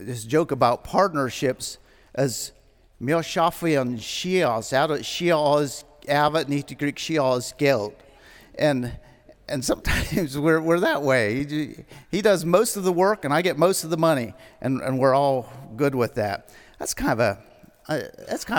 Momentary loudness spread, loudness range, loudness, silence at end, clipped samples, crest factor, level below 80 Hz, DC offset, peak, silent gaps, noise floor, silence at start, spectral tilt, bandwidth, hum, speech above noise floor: 12 LU; 4 LU; -23 LUFS; 0 s; under 0.1%; 20 dB; -46 dBFS; under 0.1%; -2 dBFS; none; -50 dBFS; 0 s; -5 dB/octave; 18 kHz; none; 27 dB